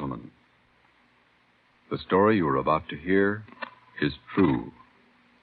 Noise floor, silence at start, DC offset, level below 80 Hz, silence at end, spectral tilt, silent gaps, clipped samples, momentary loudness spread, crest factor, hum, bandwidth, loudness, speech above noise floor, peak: -64 dBFS; 0 s; under 0.1%; -56 dBFS; 0.7 s; -10 dB/octave; none; under 0.1%; 19 LU; 20 dB; none; 4.8 kHz; -26 LUFS; 39 dB; -8 dBFS